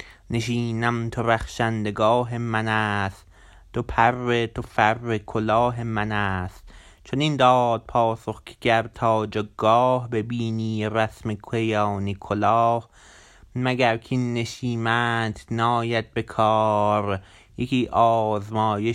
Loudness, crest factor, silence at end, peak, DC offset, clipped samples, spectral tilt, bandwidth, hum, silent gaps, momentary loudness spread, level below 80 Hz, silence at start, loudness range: -23 LUFS; 20 dB; 0 s; -4 dBFS; under 0.1%; under 0.1%; -6.5 dB/octave; 12 kHz; none; none; 9 LU; -48 dBFS; 0 s; 2 LU